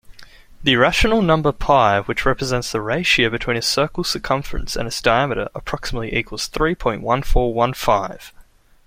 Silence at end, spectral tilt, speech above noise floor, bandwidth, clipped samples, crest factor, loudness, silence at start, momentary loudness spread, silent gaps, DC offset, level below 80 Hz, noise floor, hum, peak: 0.45 s; -4.5 dB/octave; 29 dB; 16.5 kHz; under 0.1%; 18 dB; -19 LUFS; 0.1 s; 10 LU; none; under 0.1%; -30 dBFS; -47 dBFS; none; -2 dBFS